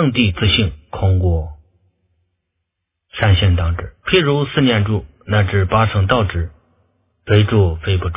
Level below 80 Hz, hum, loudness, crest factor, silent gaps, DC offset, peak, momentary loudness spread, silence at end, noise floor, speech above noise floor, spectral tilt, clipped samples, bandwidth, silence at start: -26 dBFS; none; -16 LUFS; 16 dB; none; under 0.1%; 0 dBFS; 9 LU; 0 s; -76 dBFS; 61 dB; -10.5 dB/octave; under 0.1%; 3.8 kHz; 0 s